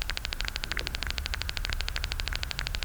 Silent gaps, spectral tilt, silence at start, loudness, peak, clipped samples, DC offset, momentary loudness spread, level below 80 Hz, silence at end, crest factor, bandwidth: none; -2.5 dB/octave; 0 s; -33 LUFS; -8 dBFS; under 0.1%; under 0.1%; 1 LU; -36 dBFS; 0 s; 24 dB; over 20 kHz